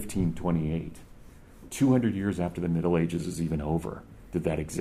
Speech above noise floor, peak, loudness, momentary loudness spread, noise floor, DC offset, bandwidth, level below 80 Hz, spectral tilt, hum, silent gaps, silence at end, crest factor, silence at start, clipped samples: 22 dB; -12 dBFS; -29 LUFS; 11 LU; -49 dBFS; under 0.1%; 14.5 kHz; -46 dBFS; -7 dB/octave; none; none; 0 s; 18 dB; 0 s; under 0.1%